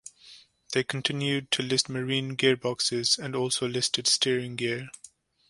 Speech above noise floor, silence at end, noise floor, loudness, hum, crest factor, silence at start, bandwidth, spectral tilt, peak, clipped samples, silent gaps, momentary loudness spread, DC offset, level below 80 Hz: 26 dB; 0.4 s; -54 dBFS; -26 LUFS; none; 20 dB; 0.05 s; 11.5 kHz; -3 dB/octave; -8 dBFS; under 0.1%; none; 8 LU; under 0.1%; -68 dBFS